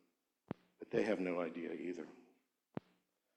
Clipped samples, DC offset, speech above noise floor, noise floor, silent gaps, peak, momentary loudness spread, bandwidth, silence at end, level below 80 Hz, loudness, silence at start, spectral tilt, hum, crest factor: under 0.1%; under 0.1%; 39 dB; -79 dBFS; none; -22 dBFS; 15 LU; 11.5 kHz; 0.6 s; -82 dBFS; -42 LUFS; 0.5 s; -7 dB/octave; none; 22 dB